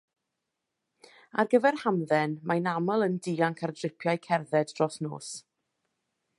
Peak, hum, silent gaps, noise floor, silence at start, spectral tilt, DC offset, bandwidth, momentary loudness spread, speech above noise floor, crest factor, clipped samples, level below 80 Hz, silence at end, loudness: -10 dBFS; none; none; -84 dBFS; 1.35 s; -6 dB/octave; under 0.1%; 11.5 kHz; 12 LU; 56 dB; 20 dB; under 0.1%; -78 dBFS; 1 s; -28 LUFS